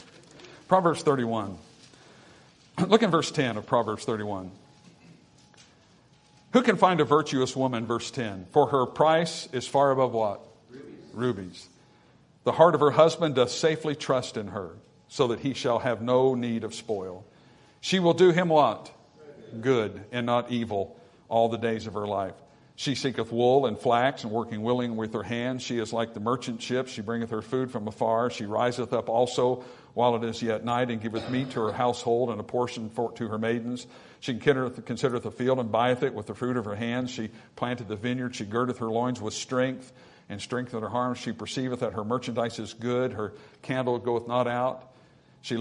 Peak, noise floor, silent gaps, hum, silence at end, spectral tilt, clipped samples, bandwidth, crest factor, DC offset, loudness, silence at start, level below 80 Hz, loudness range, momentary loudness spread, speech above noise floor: -4 dBFS; -59 dBFS; none; none; 0 s; -5.5 dB/octave; under 0.1%; 11 kHz; 24 dB; under 0.1%; -27 LUFS; 0 s; -68 dBFS; 6 LU; 12 LU; 32 dB